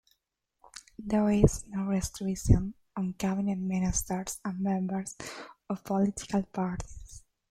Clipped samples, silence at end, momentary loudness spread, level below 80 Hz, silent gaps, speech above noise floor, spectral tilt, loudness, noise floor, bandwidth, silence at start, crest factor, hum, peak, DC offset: under 0.1%; 0.3 s; 17 LU; -42 dBFS; none; 51 dB; -6 dB/octave; -30 LUFS; -80 dBFS; 15 kHz; 0.75 s; 26 dB; none; -6 dBFS; under 0.1%